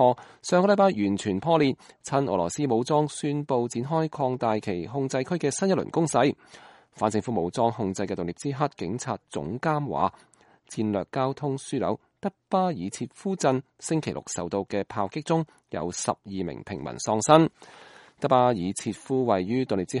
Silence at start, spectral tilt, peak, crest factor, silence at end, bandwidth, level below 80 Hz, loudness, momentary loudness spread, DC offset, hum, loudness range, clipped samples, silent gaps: 0 s; -5.5 dB/octave; -2 dBFS; 24 dB; 0 s; 11.5 kHz; -62 dBFS; -26 LUFS; 11 LU; under 0.1%; none; 5 LU; under 0.1%; none